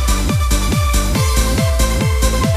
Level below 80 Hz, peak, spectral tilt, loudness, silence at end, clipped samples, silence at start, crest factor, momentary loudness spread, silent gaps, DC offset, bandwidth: -16 dBFS; -2 dBFS; -4.5 dB/octave; -16 LUFS; 0 s; under 0.1%; 0 s; 12 dB; 1 LU; none; under 0.1%; 15.5 kHz